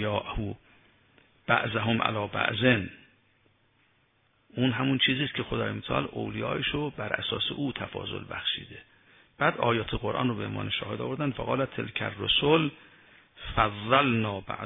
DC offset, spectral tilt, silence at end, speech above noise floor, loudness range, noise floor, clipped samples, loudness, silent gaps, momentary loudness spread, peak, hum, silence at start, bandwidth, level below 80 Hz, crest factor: under 0.1%; -9 dB/octave; 0 s; 40 dB; 3 LU; -68 dBFS; under 0.1%; -28 LUFS; none; 11 LU; -6 dBFS; none; 0 s; 3.9 kHz; -50 dBFS; 24 dB